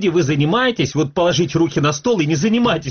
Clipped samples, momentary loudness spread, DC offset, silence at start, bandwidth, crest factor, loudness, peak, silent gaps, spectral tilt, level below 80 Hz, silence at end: under 0.1%; 2 LU; under 0.1%; 0 s; 6.8 kHz; 10 dB; -17 LUFS; -6 dBFS; none; -5 dB/octave; -48 dBFS; 0 s